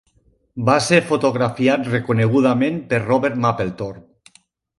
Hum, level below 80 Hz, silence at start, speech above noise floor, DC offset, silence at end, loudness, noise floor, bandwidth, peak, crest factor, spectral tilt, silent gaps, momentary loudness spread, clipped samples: none; -54 dBFS; 0.55 s; 42 dB; under 0.1%; 0.8 s; -18 LUFS; -60 dBFS; 11.5 kHz; 0 dBFS; 18 dB; -6 dB/octave; none; 9 LU; under 0.1%